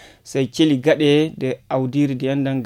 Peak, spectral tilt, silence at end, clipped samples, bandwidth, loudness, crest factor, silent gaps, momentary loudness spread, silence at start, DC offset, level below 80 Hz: -4 dBFS; -6.5 dB/octave; 0 s; under 0.1%; 13 kHz; -19 LUFS; 14 dB; none; 8 LU; 0.25 s; under 0.1%; -58 dBFS